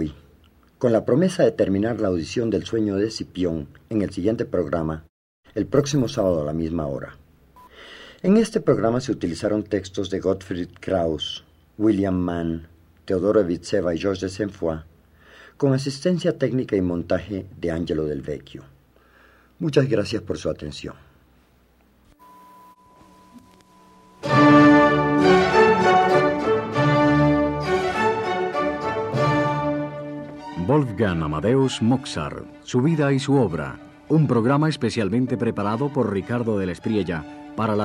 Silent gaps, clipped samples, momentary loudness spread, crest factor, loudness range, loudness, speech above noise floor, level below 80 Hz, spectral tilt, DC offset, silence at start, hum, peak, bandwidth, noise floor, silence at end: 5.09-5.43 s; under 0.1%; 14 LU; 18 dB; 9 LU; -22 LUFS; 36 dB; -48 dBFS; -6.5 dB/octave; under 0.1%; 0 s; none; -4 dBFS; 11.5 kHz; -58 dBFS; 0 s